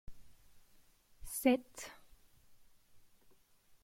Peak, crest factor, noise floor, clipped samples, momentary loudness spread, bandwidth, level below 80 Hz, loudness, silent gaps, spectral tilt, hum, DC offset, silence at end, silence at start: -16 dBFS; 26 dB; -67 dBFS; under 0.1%; 19 LU; 16.5 kHz; -62 dBFS; -35 LUFS; none; -3.5 dB/octave; none; under 0.1%; 0.85 s; 0.1 s